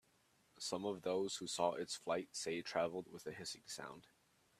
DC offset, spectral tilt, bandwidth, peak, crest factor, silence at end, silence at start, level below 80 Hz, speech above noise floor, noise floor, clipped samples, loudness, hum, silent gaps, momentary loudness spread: under 0.1%; -3 dB/octave; 15 kHz; -22 dBFS; 22 dB; 0.6 s; 0.55 s; -82 dBFS; 33 dB; -75 dBFS; under 0.1%; -43 LUFS; none; none; 10 LU